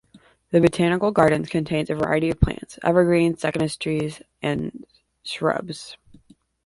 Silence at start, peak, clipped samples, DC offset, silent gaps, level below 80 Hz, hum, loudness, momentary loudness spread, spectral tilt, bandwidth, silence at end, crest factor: 0.15 s; -2 dBFS; under 0.1%; under 0.1%; none; -38 dBFS; none; -22 LUFS; 14 LU; -6.5 dB/octave; 11.5 kHz; 0.7 s; 20 dB